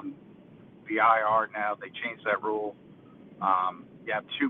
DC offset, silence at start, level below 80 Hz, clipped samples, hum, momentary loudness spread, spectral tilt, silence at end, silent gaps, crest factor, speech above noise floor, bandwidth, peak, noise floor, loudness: under 0.1%; 0 s; -72 dBFS; under 0.1%; none; 15 LU; -7 dB/octave; 0 s; none; 22 dB; 24 dB; 4.3 kHz; -8 dBFS; -52 dBFS; -28 LUFS